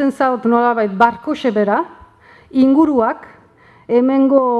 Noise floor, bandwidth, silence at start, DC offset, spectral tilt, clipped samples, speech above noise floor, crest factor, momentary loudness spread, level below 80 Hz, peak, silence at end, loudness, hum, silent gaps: -47 dBFS; 8.2 kHz; 0 s; under 0.1%; -7.5 dB/octave; under 0.1%; 34 dB; 16 dB; 8 LU; -54 dBFS; 0 dBFS; 0 s; -15 LUFS; none; none